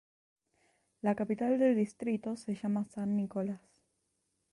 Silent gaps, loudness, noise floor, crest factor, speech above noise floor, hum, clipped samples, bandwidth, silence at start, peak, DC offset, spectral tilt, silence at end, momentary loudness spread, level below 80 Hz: none; -33 LUFS; -81 dBFS; 18 dB; 48 dB; none; under 0.1%; 11.5 kHz; 1.05 s; -18 dBFS; under 0.1%; -8 dB/octave; 0.95 s; 9 LU; -74 dBFS